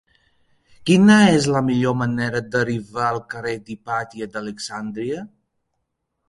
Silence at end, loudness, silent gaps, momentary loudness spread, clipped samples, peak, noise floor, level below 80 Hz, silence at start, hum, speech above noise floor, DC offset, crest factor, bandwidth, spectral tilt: 1 s; -20 LUFS; none; 16 LU; under 0.1%; 0 dBFS; -75 dBFS; -54 dBFS; 0.8 s; none; 56 dB; under 0.1%; 20 dB; 11.5 kHz; -5.5 dB/octave